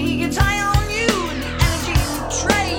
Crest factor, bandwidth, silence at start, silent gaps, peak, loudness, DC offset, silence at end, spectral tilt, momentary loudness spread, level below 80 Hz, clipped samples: 18 dB; 18 kHz; 0 s; none; 0 dBFS; -19 LUFS; under 0.1%; 0 s; -4 dB/octave; 4 LU; -26 dBFS; under 0.1%